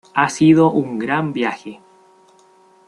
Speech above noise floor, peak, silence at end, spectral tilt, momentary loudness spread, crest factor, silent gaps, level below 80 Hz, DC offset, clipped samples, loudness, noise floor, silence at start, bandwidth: 35 dB; -2 dBFS; 1.1 s; -6 dB/octave; 15 LU; 18 dB; none; -60 dBFS; under 0.1%; under 0.1%; -16 LUFS; -51 dBFS; 0.15 s; 11 kHz